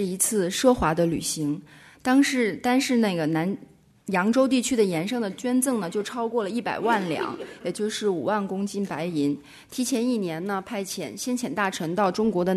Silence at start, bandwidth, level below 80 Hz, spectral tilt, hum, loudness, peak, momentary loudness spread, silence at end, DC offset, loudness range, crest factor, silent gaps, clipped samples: 0 s; 13.5 kHz; -54 dBFS; -4.5 dB/octave; none; -25 LUFS; -6 dBFS; 9 LU; 0 s; under 0.1%; 4 LU; 18 dB; none; under 0.1%